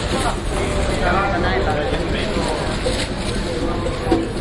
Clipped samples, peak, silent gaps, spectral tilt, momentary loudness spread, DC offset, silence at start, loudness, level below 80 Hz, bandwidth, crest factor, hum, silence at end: under 0.1%; -4 dBFS; none; -5 dB/octave; 4 LU; under 0.1%; 0 s; -21 LUFS; -26 dBFS; 11.5 kHz; 16 dB; none; 0 s